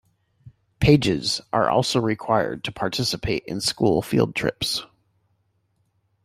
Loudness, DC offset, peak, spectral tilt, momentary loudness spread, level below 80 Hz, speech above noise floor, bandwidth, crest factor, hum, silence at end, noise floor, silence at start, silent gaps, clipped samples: -22 LUFS; under 0.1%; -4 dBFS; -5 dB/octave; 8 LU; -46 dBFS; 47 dB; 16 kHz; 20 dB; none; 1.4 s; -69 dBFS; 0.45 s; none; under 0.1%